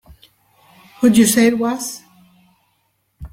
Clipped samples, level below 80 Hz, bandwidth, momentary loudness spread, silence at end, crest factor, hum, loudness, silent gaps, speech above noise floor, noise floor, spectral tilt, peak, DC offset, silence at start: under 0.1%; -48 dBFS; 16.5 kHz; 16 LU; 0.05 s; 18 dB; none; -15 LUFS; none; 52 dB; -66 dBFS; -4 dB/octave; -2 dBFS; under 0.1%; 1 s